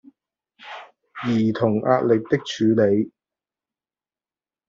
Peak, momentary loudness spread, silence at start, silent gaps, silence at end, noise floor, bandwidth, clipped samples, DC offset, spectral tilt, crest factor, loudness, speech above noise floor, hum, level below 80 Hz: -4 dBFS; 20 LU; 0.65 s; none; 1.6 s; under -90 dBFS; 7.4 kHz; under 0.1%; under 0.1%; -7 dB/octave; 20 dB; -21 LUFS; over 71 dB; none; -64 dBFS